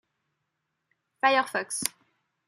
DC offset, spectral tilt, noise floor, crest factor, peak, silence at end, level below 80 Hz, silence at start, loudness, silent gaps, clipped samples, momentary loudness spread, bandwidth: under 0.1%; -1 dB/octave; -81 dBFS; 28 dB; -2 dBFS; 0.6 s; -78 dBFS; 1.25 s; -26 LUFS; none; under 0.1%; 8 LU; 14.5 kHz